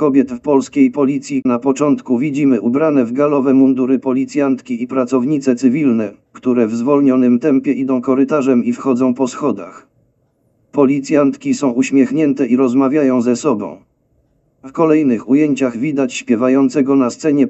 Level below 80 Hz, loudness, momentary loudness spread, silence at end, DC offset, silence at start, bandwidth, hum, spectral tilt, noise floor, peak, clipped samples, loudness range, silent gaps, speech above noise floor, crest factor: -62 dBFS; -14 LUFS; 6 LU; 0 s; under 0.1%; 0 s; 8.2 kHz; none; -6.5 dB/octave; -60 dBFS; 0 dBFS; under 0.1%; 3 LU; none; 46 dB; 14 dB